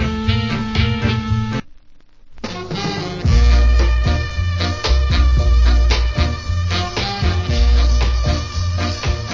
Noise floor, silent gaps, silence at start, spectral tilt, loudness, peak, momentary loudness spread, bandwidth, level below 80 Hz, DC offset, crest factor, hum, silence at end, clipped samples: -41 dBFS; none; 0 s; -5.5 dB/octave; -18 LUFS; -2 dBFS; 8 LU; 7.4 kHz; -18 dBFS; under 0.1%; 14 dB; none; 0 s; under 0.1%